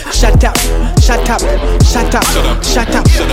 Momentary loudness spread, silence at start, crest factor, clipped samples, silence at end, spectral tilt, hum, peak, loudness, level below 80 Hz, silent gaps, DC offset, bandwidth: 3 LU; 0 s; 10 dB; under 0.1%; 0 s; -4.5 dB/octave; none; 0 dBFS; -11 LUFS; -12 dBFS; none; under 0.1%; 16.5 kHz